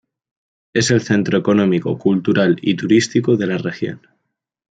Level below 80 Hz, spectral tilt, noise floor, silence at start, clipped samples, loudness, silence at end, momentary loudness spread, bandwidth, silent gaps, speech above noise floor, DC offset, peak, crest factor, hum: -58 dBFS; -5.5 dB/octave; -75 dBFS; 0.75 s; under 0.1%; -17 LUFS; 0.75 s; 8 LU; 9.4 kHz; none; 59 dB; under 0.1%; -2 dBFS; 16 dB; none